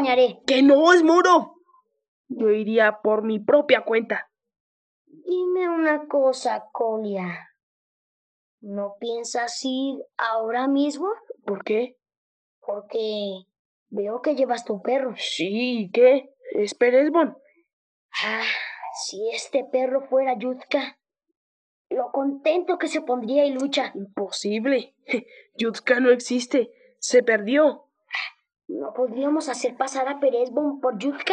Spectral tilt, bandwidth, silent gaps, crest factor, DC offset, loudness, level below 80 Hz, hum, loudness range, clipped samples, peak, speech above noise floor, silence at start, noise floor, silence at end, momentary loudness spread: -4 dB/octave; 9.8 kHz; 2.08-2.24 s, 4.60-5.05 s, 7.63-8.58 s, 12.17-12.62 s, 13.59-13.86 s, 17.73-18.09 s, 21.36-21.85 s; 20 dB; under 0.1%; -23 LUFS; -82 dBFS; none; 7 LU; under 0.1%; -2 dBFS; 40 dB; 0 s; -62 dBFS; 0 s; 13 LU